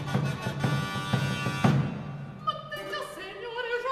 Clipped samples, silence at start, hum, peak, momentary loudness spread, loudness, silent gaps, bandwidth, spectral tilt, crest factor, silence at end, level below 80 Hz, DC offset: under 0.1%; 0 s; none; -10 dBFS; 12 LU; -30 LUFS; none; 14 kHz; -6 dB/octave; 20 dB; 0 s; -56 dBFS; under 0.1%